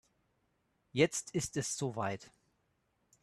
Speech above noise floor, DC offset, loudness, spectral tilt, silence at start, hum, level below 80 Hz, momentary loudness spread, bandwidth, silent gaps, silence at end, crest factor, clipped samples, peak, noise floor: 43 dB; under 0.1%; -35 LUFS; -4 dB/octave; 0.95 s; none; -68 dBFS; 9 LU; 13 kHz; none; 0.95 s; 24 dB; under 0.1%; -14 dBFS; -78 dBFS